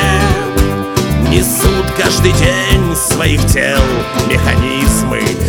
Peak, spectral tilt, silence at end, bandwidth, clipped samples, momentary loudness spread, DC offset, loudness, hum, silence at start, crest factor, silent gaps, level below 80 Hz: 0 dBFS; -4.5 dB/octave; 0 s; 19.5 kHz; under 0.1%; 4 LU; under 0.1%; -12 LUFS; none; 0 s; 12 dB; none; -18 dBFS